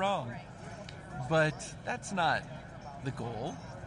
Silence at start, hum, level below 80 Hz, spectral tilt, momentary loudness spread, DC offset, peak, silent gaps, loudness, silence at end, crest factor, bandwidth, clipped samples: 0 s; none; -58 dBFS; -5 dB/octave; 16 LU; under 0.1%; -16 dBFS; none; -34 LUFS; 0 s; 18 dB; 11.5 kHz; under 0.1%